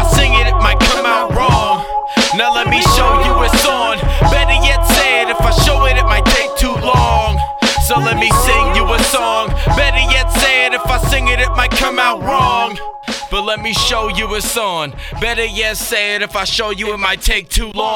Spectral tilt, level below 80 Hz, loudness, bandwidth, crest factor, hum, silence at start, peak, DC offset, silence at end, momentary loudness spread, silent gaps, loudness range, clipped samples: -3.5 dB/octave; -18 dBFS; -13 LUFS; 18.5 kHz; 12 dB; none; 0 s; 0 dBFS; under 0.1%; 0 s; 6 LU; none; 4 LU; under 0.1%